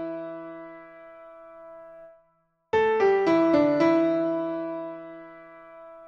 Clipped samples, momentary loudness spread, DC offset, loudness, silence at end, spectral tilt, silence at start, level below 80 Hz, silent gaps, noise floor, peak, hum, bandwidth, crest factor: under 0.1%; 26 LU; under 0.1%; -23 LUFS; 0 s; -7 dB/octave; 0 s; -64 dBFS; none; -69 dBFS; -10 dBFS; none; 7 kHz; 16 dB